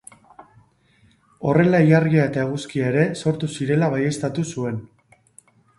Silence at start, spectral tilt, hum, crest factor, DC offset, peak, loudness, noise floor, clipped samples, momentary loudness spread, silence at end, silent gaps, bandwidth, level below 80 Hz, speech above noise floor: 1.4 s; -7 dB/octave; none; 18 dB; under 0.1%; -2 dBFS; -20 LUFS; -58 dBFS; under 0.1%; 11 LU; 0.95 s; none; 11.5 kHz; -56 dBFS; 39 dB